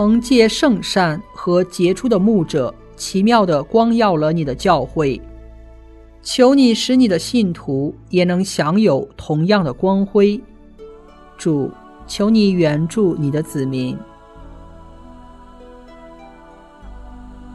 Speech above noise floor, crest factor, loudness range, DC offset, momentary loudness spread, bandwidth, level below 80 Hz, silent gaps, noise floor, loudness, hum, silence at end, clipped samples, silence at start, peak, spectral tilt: 27 dB; 16 dB; 5 LU; under 0.1%; 9 LU; 12.5 kHz; -42 dBFS; none; -42 dBFS; -16 LUFS; none; 0 s; under 0.1%; 0 s; 0 dBFS; -6 dB/octave